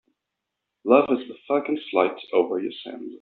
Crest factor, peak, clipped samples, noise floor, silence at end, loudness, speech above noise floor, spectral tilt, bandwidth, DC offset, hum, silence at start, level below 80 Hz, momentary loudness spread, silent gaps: 22 dB; -2 dBFS; under 0.1%; -83 dBFS; 0.05 s; -23 LUFS; 60 dB; -3 dB/octave; 4.5 kHz; under 0.1%; none; 0.85 s; -72 dBFS; 15 LU; none